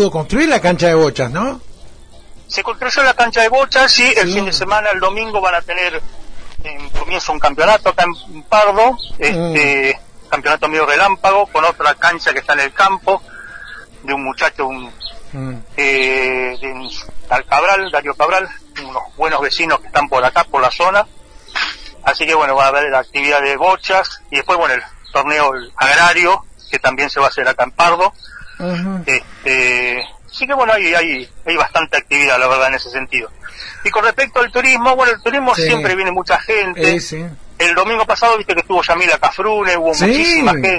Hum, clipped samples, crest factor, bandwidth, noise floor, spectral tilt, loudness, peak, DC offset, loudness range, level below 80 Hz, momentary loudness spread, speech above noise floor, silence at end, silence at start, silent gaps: none; under 0.1%; 14 dB; 10.5 kHz; -36 dBFS; -3.5 dB/octave; -13 LUFS; 0 dBFS; under 0.1%; 4 LU; -38 dBFS; 14 LU; 22 dB; 0 s; 0 s; none